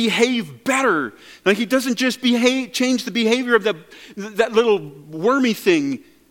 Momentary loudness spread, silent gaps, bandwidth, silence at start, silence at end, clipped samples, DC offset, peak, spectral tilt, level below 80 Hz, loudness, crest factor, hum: 12 LU; none; 17.5 kHz; 0 s; 0.35 s; under 0.1%; under 0.1%; 0 dBFS; -3.5 dB/octave; -66 dBFS; -19 LUFS; 18 dB; none